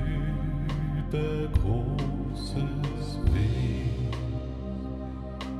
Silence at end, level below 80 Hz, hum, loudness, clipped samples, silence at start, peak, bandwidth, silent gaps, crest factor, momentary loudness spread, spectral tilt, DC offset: 0 s; -34 dBFS; none; -30 LUFS; under 0.1%; 0 s; -12 dBFS; 11.5 kHz; none; 16 dB; 8 LU; -8 dB/octave; under 0.1%